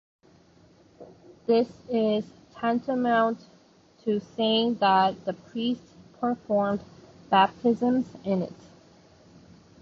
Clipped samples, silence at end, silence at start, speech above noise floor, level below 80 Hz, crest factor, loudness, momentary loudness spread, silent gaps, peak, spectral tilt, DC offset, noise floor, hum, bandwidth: under 0.1%; 1.3 s; 1 s; 33 dB; -66 dBFS; 20 dB; -26 LUFS; 12 LU; none; -8 dBFS; -6.5 dB/octave; under 0.1%; -58 dBFS; none; 7.2 kHz